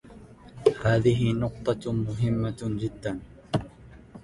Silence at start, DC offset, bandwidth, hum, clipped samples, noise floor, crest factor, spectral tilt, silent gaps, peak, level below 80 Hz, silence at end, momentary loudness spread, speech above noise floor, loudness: 0.05 s; under 0.1%; 11.5 kHz; none; under 0.1%; -48 dBFS; 22 dB; -7.5 dB/octave; none; -6 dBFS; -48 dBFS; 0.05 s; 11 LU; 22 dB; -27 LUFS